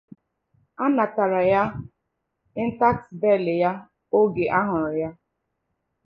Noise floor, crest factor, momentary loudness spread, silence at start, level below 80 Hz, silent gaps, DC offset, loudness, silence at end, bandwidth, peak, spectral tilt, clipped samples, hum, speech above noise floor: -78 dBFS; 18 dB; 9 LU; 0.8 s; -56 dBFS; none; under 0.1%; -23 LUFS; 0.95 s; 5.4 kHz; -6 dBFS; -9.5 dB/octave; under 0.1%; none; 56 dB